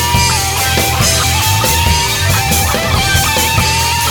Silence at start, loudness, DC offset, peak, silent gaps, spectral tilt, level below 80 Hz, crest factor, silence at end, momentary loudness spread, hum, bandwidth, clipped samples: 0 s; -11 LUFS; under 0.1%; 0 dBFS; none; -2.5 dB/octave; -24 dBFS; 12 dB; 0 s; 1 LU; none; over 20 kHz; under 0.1%